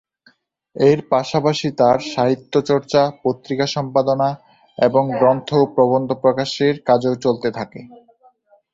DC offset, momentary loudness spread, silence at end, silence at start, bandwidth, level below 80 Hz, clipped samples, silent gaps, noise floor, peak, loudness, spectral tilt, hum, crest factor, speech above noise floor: under 0.1%; 7 LU; 0.8 s; 0.75 s; 7.8 kHz; -58 dBFS; under 0.1%; none; -57 dBFS; -2 dBFS; -18 LUFS; -6 dB/octave; none; 16 dB; 40 dB